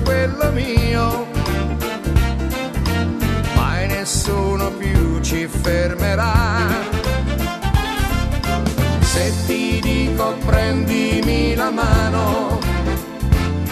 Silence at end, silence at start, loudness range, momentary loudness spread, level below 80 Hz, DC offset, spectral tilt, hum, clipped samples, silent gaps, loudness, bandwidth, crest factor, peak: 0 s; 0 s; 2 LU; 4 LU; -22 dBFS; under 0.1%; -5.5 dB/octave; none; under 0.1%; none; -19 LUFS; 14 kHz; 16 dB; 0 dBFS